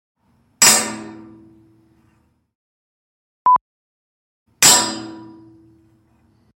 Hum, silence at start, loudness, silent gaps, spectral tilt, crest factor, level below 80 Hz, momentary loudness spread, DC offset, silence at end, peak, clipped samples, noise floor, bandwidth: none; 0.6 s; -13 LUFS; 2.55-3.45 s, 3.61-4.46 s; 0 dB/octave; 22 dB; -64 dBFS; 23 LU; under 0.1%; 1.3 s; 0 dBFS; under 0.1%; -61 dBFS; 16.5 kHz